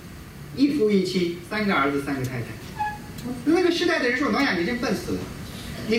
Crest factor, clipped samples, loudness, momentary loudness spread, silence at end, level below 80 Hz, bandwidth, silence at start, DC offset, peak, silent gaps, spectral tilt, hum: 14 dB; under 0.1%; -24 LUFS; 14 LU; 0 s; -48 dBFS; 16 kHz; 0 s; under 0.1%; -10 dBFS; none; -5.5 dB/octave; none